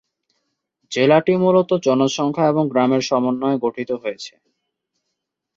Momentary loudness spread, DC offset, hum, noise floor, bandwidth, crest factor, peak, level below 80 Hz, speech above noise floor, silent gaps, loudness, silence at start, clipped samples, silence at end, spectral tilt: 11 LU; under 0.1%; none; -78 dBFS; 7.8 kHz; 18 dB; -2 dBFS; -64 dBFS; 61 dB; none; -18 LUFS; 0.9 s; under 0.1%; 1.3 s; -6 dB/octave